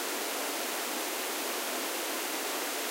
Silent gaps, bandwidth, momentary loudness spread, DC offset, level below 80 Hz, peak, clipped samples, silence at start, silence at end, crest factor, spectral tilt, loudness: none; 16 kHz; 0 LU; under 0.1%; under -90 dBFS; -20 dBFS; under 0.1%; 0 s; 0 s; 14 dB; 0.5 dB/octave; -32 LUFS